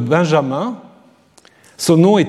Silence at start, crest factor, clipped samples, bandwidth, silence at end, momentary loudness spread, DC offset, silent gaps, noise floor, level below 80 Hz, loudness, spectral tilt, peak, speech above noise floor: 0 s; 14 dB; under 0.1%; 14 kHz; 0 s; 13 LU; under 0.1%; none; -50 dBFS; -62 dBFS; -16 LUFS; -6 dB/octave; 0 dBFS; 36 dB